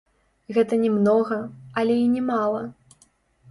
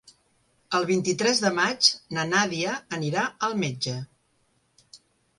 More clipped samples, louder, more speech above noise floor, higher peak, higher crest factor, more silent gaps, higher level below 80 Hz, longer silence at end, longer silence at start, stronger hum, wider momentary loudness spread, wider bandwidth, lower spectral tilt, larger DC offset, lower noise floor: neither; about the same, -22 LUFS vs -24 LUFS; second, 39 dB vs 43 dB; about the same, -8 dBFS vs -6 dBFS; second, 16 dB vs 22 dB; neither; about the same, -64 dBFS vs -68 dBFS; first, 0.8 s vs 0.4 s; second, 0.5 s vs 0.7 s; neither; about the same, 11 LU vs 10 LU; about the same, 11.5 kHz vs 11.5 kHz; first, -7.5 dB/octave vs -3 dB/octave; neither; second, -61 dBFS vs -68 dBFS